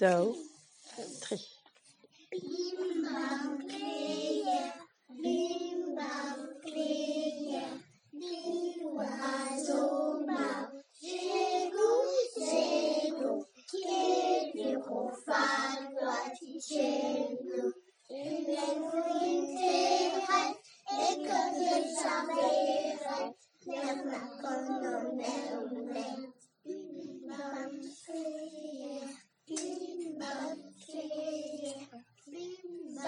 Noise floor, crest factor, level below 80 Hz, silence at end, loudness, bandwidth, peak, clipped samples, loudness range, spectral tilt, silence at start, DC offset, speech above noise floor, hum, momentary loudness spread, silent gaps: -64 dBFS; 22 dB; under -90 dBFS; 0 s; -35 LUFS; 11 kHz; -14 dBFS; under 0.1%; 10 LU; -3.5 dB/octave; 0 s; under 0.1%; 31 dB; none; 15 LU; none